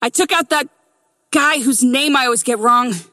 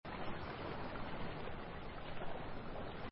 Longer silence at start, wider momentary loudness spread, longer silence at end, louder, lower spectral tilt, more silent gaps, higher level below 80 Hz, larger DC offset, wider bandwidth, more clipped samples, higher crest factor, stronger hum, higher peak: about the same, 0 s vs 0.05 s; about the same, 5 LU vs 3 LU; about the same, 0.1 s vs 0 s; first, -15 LUFS vs -47 LUFS; second, -2 dB/octave vs -4.5 dB/octave; neither; second, -68 dBFS vs -52 dBFS; neither; first, 16 kHz vs 5.6 kHz; neither; about the same, 14 dB vs 14 dB; neither; first, -2 dBFS vs -30 dBFS